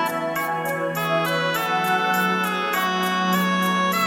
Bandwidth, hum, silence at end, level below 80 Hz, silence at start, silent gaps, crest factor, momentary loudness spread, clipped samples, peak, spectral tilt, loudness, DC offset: 17 kHz; none; 0 s; -68 dBFS; 0 s; none; 12 dB; 4 LU; under 0.1%; -10 dBFS; -4 dB/octave; -21 LUFS; under 0.1%